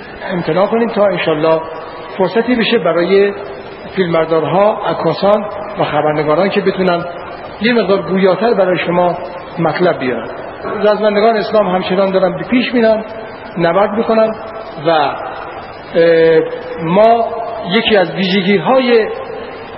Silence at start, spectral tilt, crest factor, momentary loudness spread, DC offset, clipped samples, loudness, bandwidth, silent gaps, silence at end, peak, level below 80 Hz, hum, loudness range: 0 s; -9.5 dB/octave; 14 dB; 14 LU; under 0.1%; under 0.1%; -13 LUFS; 5.8 kHz; none; 0 s; 0 dBFS; -48 dBFS; none; 2 LU